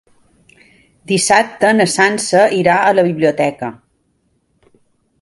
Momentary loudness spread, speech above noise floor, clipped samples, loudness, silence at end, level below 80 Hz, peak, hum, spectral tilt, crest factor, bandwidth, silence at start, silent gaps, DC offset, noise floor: 7 LU; 49 dB; under 0.1%; -13 LUFS; 1.45 s; -56 dBFS; 0 dBFS; none; -4 dB/octave; 16 dB; 11.5 kHz; 1.1 s; none; under 0.1%; -62 dBFS